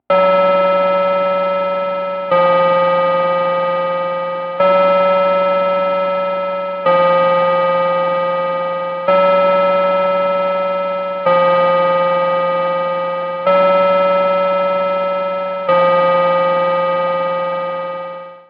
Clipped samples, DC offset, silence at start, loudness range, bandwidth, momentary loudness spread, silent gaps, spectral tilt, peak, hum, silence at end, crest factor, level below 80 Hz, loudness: under 0.1%; under 0.1%; 0.1 s; 1 LU; 5.4 kHz; 7 LU; none; -7.5 dB/octave; -2 dBFS; none; 0.1 s; 12 dB; -62 dBFS; -15 LUFS